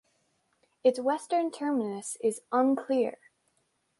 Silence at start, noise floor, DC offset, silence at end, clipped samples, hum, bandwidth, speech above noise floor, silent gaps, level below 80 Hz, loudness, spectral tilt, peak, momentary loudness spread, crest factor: 0.85 s; -75 dBFS; under 0.1%; 0.85 s; under 0.1%; none; 11.5 kHz; 46 dB; none; -80 dBFS; -29 LUFS; -4.5 dB/octave; -12 dBFS; 5 LU; 18 dB